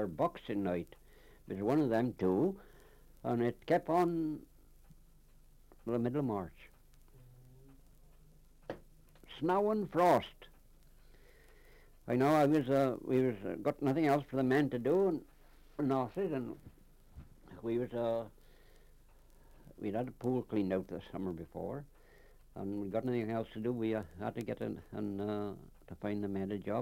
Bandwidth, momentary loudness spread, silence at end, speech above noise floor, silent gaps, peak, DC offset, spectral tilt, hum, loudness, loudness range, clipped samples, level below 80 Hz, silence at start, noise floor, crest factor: 16.5 kHz; 17 LU; 0 s; 27 dB; none; -18 dBFS; under 0.1%; -8 dB/octave; none; -35 LUFS; 9 LU; under 0.1%; -62 dBFS; 0 s; -61 dBFS; 18 dB